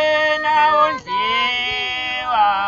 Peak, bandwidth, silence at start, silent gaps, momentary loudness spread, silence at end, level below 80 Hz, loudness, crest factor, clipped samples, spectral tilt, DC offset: -4 dBFS; 7.8 kHz; 0 s; none; 6 LU; 0 s; -52 dBFS; -17 LUFS; 14 dB; under 0.1%; -2.5 dB/octave; under 0.1%